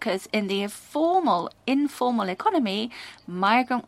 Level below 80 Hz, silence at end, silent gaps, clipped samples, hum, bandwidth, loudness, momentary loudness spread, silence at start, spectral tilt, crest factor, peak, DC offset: -70 dBFS; 0.05 s; none; under 0.1%; none; 15.5 kHz; -25 LUFS; 9 LU; 0 s; -5 dB/octave; 18 dB; -6 dBFS; under 0.1%